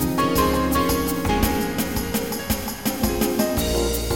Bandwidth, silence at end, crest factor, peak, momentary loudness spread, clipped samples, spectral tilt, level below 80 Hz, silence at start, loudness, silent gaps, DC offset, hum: 17 kHz; 0 s; 16 dB; -4 dBFS; 5 LU; under 0.1%; -4.5 dB/octave; -32 dBFS; 0 s; -22 LUFS; none; 0.6%; none